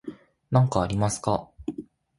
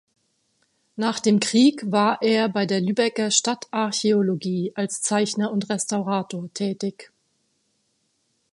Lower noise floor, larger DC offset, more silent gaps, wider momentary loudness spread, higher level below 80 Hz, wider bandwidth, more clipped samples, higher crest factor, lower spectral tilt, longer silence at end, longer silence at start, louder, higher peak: second, -43 dBFS vs -70 dBFS; neither; neither; first, 16 LU vs 8 LU; first, -48 dBFS vs -72 dBFS; about the same, 11.5 kHz vs 11.5 kHz; neither; about the same, 20 dB vs 20 dB; first, -6.5 dB/octave vs -4 dB/octave; second, 0.35 s vs 1.5 s; second, 0.05 s vs 0.95 s; second, -25 LUFS vs -22 LUFS; second, -8 dBFS vs -2 dBFS